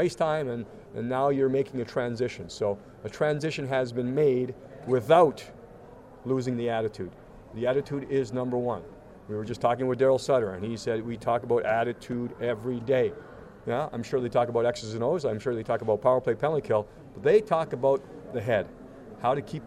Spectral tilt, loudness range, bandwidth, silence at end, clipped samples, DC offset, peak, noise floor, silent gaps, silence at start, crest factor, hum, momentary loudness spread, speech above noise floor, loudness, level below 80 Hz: -6.5 dB/octave; 4 LU; 13 kHz; 0 s; under 0.1%; under 0.1%; -8 dBFS; -48 dBFS; none; 0 s; 20 dB; none; 13 LU; 22 dB; -28 LUFS; -58 dBFS